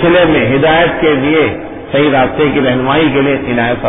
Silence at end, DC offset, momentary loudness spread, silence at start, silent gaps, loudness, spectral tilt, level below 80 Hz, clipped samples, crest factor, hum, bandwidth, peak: 0 s; under 0.1%; 5 LU; 0 s; none; -11 LUFS; -10 dB/octave; -36 dBFS; under 0.1%; 10 dB; none; 3.9 kHz; 0 dBFS